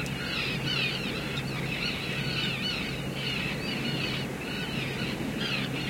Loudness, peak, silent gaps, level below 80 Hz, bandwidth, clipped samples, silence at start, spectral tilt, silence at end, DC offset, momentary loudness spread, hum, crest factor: -30 LUFS; -16 dBFS; none; -50 dBFS; 16.5 kHz; under 0.1%; 0 s; -4.5 dB/octave; 0 s; under 0.1%; 4 LU; none; 14 dB